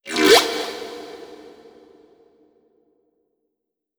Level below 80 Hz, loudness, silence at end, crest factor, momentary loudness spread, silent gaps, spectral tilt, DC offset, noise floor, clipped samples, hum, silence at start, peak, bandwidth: -60 dBFS; -16 LUFS; 2.65 s; 24 dB; 26 LU; none; -1.5 dB/octave; under 0.1%; -81 dBFS; under 0.1%; none; 0.05 s; 0 dBFS; over 20 kHz